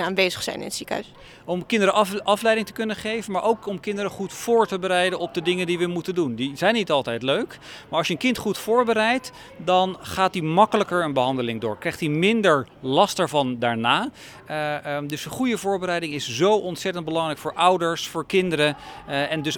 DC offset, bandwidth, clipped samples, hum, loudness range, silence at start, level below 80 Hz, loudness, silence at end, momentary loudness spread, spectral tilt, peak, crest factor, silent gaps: under 0.1%; 19 kHz; under 0.1%; none; 2 LU; 0 s; -58 dBFS; -23 LUFS; 0 s; 9 LU; -4.5 dB/octave; -2 dBFS; 20 dB; none